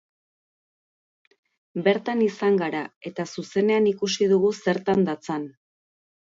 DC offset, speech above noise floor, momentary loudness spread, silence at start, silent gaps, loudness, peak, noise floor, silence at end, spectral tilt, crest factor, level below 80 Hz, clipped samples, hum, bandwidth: under 0.1%; over 67 dB; 12 LU; 1.75 s; 2.96-3.01 s; -24 LUFS; -6 dBFS; under -90 dBFS; 0.9 s; -5.5 dB/octave; 18 dB; -68 dBFS; under 0.1%; none; 7.8 kHz